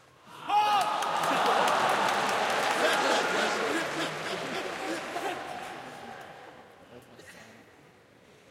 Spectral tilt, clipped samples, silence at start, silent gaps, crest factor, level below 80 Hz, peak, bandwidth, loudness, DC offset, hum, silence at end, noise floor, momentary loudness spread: -2.5 dB/octave; under 0.1%; 0.25 s; none; 18 dB; -74 dBFS; -12 dBFS; 16.5 kHz; -28 LUFS; under 0.1%; none; 0.9 s; -57 dBFS; 19 LU